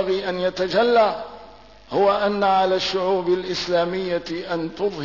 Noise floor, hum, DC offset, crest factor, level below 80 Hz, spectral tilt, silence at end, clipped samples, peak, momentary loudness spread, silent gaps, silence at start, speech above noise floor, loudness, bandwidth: -45 dBFS; 50 Hz at -55 dBFS; 0.2%; 14 dB; -54 dBFS; -5 dB/octave; 0 s; under 0.1%; -8 dBFS; 9 LU; none; 0 s; 25 dB; -21 LUFS; 6 kHz